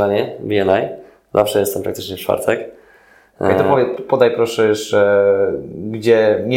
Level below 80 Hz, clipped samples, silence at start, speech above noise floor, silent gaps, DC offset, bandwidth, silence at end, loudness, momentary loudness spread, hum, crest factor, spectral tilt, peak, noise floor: -54 dBFS; under 0.1%; 0 s; 34 dB; none; under 0.1%; 17 kHz; 0 s; -16 LUFS; 11 LU; none; 16 dB; -5.5 dB/octave; 0 dBFS; -49 dBFS